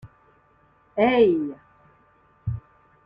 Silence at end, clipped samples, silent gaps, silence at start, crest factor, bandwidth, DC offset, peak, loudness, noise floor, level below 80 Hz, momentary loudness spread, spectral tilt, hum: 0.45 s; under 0.1%; none; 0.05 s; 20 dB; 5.2 kHz; under 0.1%; -6 dBFS; -23 LUFS; -60 dBFS; -54 dBFS; 18 LU; -9.5 dB/octave; none